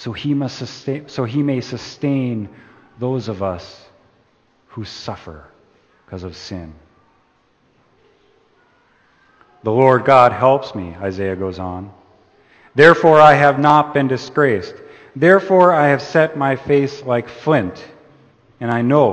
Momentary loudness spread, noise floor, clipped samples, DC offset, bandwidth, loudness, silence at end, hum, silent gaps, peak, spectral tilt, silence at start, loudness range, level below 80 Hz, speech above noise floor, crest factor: 21 LU; -59 dBFS; under 0.1%; under 0.1%; 8.8 kHz; -15 LUFS; 0 s; none; none; 0 dBFS; -7 dB/octave; 0 s; 21 LU; -54 dBFS; 43 dB; 18 dB